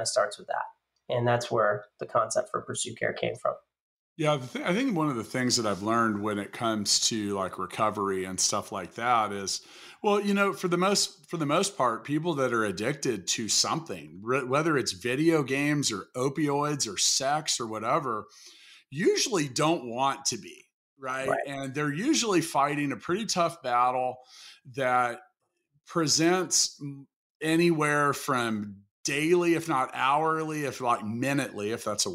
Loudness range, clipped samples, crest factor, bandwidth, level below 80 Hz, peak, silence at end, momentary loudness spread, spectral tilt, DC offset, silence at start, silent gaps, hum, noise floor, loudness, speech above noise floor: 3 LU; under 0.1%; 16 dB; 16 kHz; -72 dBFS; -12 dBFS; 0 s; 10 LU; -3.5 dB/octave; under 0.1%; 0 s; 3.80-4.16 s, 20.74-20.96 s, 27.16-27.40 s, 28.91-29.04 s; none; -74 dBFS; -27 LUFS; 46 dB